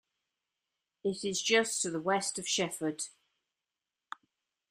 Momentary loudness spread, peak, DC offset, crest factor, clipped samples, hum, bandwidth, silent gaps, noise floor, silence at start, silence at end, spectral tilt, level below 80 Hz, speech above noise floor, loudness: 22 LU; -14 dBFS; under 0.1%; 22 dB; under 0.1%; none; 15.5 kHz; none; under -90 dBFS; 1.05 s; 1.6 s; -2 dB/octave; -76 dBFS; over 58 dB; -32 LUFS